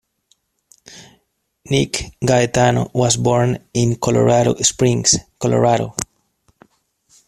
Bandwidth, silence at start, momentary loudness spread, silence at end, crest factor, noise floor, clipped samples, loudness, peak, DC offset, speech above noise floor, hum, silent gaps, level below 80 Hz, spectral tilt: 14 kHz; 0.95 s; 7 LU; 1.25 s; 18 dB; -66 dBFS; under 0.1%; -16 LUFS; 0 dBFS; under 0.1%; 50 dB; none; none; -46 dBFS; -4.5 dB/octave